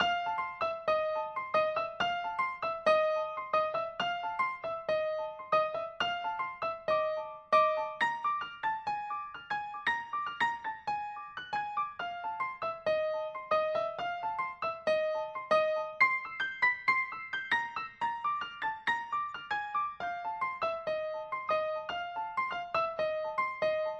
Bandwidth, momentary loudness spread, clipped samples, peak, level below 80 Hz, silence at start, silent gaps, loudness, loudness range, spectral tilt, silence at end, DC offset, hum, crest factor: 8.8 kHz; 8 LU; under 0.1%; -14 dBFS; -70 dBFS; 0 s; none; -33 LUFS; 5 LU; -3.5 dB/octave; 0 s; under 0.1%; none; 20 dB